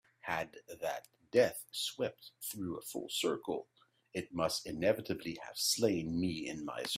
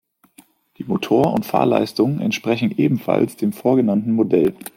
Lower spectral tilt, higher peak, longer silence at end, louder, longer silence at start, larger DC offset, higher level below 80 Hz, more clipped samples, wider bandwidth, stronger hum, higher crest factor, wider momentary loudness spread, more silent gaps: second, -3.5 dB/octave vs -7 dB/octave; second, -16 dBFS vs -2 dBFS; second, 0 s vs 0.25 s; second, -37 LUFS vs -19 LUFS; second, 0.25 s vs 0.8 s; neither; second, -68 dBFS vs -58 dBFS; neither; about the same, 16 kHz vs 16.5 kHz; neither; first, 22 dB vs 16 dB; first, 12 LU vs 4 LU; neither